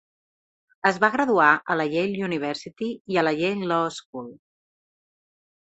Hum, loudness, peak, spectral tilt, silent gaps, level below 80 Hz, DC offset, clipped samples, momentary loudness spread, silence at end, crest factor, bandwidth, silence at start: none; -23 LUFS; -4 dBFS; -5.5 dB/octave; 3.01-3.05 s, 4.05-4.13 s; -68 dBFS; under 0.1%; under 0.1%; 15 LU; 1.35 s; 22 dB; 8.4 kHz; 0.85 s